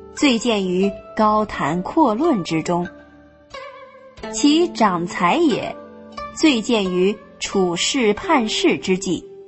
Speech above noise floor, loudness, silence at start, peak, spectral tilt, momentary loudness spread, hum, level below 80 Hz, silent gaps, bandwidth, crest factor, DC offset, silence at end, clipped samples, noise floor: 29 dB; -19 LUFS; 0 s; -2 dBFS; -4.5 dB/octave; 16 LU; none; -50 dBFS; none; 8.4 kHz; 16 dB; under 0.1%; 0 s; under 0.1%; -47 dBFS